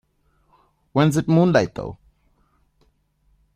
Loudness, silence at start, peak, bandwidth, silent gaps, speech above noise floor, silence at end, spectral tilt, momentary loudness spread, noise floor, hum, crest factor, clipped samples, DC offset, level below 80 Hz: -19 LUFS; 0.95 s; -2 dBFS; 14.5 kHz; none; 46 dB; 1.6 s; -7 dB/octave; 16 LU; -64 dBFS; none; 20 dB; under 0.1%; under 0.1%; -52 dBFS